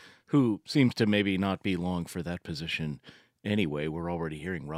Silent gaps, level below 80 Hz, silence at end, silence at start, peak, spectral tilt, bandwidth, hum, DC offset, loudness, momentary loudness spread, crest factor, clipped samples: none; -58 dBFS; 0 s; 0 s; -10 dBFS; -6.5 dB/octave; 15.5 kHz; none; under 0.1%; -30 LUFS; 10 LU; 20 dB; under 0.1%